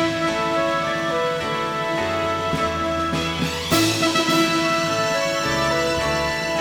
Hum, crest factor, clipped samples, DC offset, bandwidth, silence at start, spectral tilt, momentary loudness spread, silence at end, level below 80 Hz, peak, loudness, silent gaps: none; 16 dB; under 0.1%; under 0.1%; over 20 kHz; 0 s; -4 dB/octave; 5 LU; 0 s; -44 dBFS; -4 dBFS; -21 LUFS; none